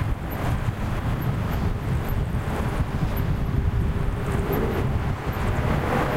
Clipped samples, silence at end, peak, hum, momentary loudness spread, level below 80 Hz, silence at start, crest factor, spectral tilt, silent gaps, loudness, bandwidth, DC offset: under 0.1%; 0 s; -10 dBFS; none; 3 LU; -28 dBFS; 0 s; 14 dB; -7.5 dB/octave; none; -26 LUFS; 16 kHz; 0.3%